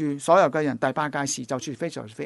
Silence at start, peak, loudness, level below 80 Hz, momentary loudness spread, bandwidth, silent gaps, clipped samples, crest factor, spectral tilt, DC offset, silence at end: 0 s; -6 dBFS; -24 LUFS; -68 dBFS; 12 LU; 11.5 kHz; none; under 0.1%; 18 dB; -4.5 dB/octave; under 0.1%; 0 s